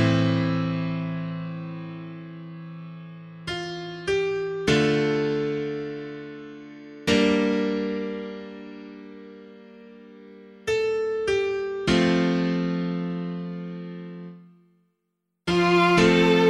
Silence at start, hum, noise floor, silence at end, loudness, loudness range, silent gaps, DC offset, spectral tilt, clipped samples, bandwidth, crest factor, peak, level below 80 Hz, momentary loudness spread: 0 s; none; -78 dBFS; 0 s; -24 LUFS; 7 LU; none; under 0.1%; -6 dB/octave; under 0.1%; 11.5 kHz; 20 dB; -6 dBFS; -52 dBFS; 20 LU